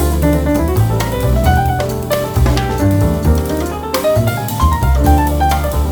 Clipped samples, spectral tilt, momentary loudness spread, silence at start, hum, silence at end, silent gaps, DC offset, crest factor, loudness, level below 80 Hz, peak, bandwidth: under 0.1%; -6.5 dB/octave; 5 LU; 0 s; none; 0 s; none; under 0.1%; 12 dB; -14 LUFS; -18 dBFS; 0 dBFS; over 20 kHz